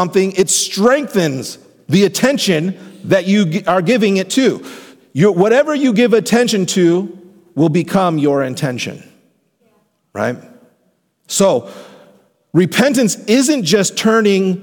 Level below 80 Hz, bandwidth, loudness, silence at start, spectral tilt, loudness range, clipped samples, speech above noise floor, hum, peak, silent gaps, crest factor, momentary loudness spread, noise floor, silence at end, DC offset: -60 dBFS; 19 kHz; -14 LUFS; 0 s; -4.5 dB/octave; 8 LU; under 0.1%; 48 dB; none; -2 dBFS; none; 14 dB; 13 LU; -61 dBFS; 0 s; under 0.1%